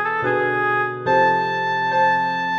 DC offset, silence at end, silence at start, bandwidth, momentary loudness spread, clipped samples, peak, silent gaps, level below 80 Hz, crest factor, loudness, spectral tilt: under 0.1%; 0 s; 0 s; 7.4 kHz; 4 LU; under 0.1%; -6 dBFS; none; -58 dBFS; 14 dB; -19 LUFS; -5.5 dB/octave